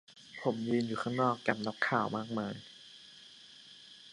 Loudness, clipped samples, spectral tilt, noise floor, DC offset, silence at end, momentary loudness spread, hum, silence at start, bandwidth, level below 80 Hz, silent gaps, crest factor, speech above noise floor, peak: -34 LUFS; under 0.1%; -6 dB/octave; -55 dBFS; under 0.1%; 0 s; 21 LU; none; 0.1 s; 11 kHz; -76 dBFS; none; 24 dB; 22 dB; -12 dBFS